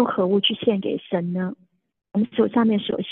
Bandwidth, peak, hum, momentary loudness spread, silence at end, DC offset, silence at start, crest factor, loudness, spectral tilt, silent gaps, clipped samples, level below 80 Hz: 4.1 kHz; -6 dBFS; none; 8 LU; 0 s; under 0.1%; 0 s; 16 dB; -22 LUFS; -9.5 dB/octave; none; under 0.1%; -66 dBFS